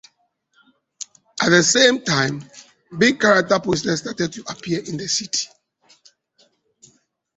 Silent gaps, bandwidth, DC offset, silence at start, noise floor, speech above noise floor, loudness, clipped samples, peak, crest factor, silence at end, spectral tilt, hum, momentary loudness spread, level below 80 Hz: none; 8.4 kHz; under 0.1%; 1.35 s; -66 dBFS; 47 dB; -18 LUFS; under 0.1%; -2 dBFS; 20 dB; 1.9 s; -3 dB/octave; none; 20 LU; -58 dBFS